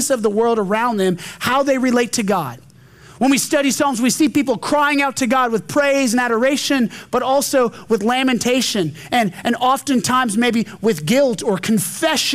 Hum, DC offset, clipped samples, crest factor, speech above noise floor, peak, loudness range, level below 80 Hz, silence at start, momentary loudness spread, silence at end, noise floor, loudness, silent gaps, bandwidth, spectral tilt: none; under 0.1%; under 0.1%; 10 dB; 27 dB; -6 dBFS; 2 LU; -56 dBFS; 0 s; 4 LU; 0 s; -44 dBFS; -17 LUFS; none; 16 kHz; -3.5 dB/octave